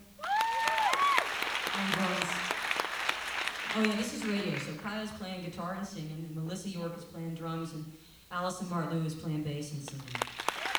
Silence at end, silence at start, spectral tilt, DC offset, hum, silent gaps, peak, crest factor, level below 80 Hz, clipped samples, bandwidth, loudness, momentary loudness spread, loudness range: 0 s; 0 s; -4 dB/octave; under 0.1%; none; none; -8 dBFS; 26 dB; -64 dBFS; under 0.1%; over 20 kHz; -33 LUFS; 12 LU; 9 LU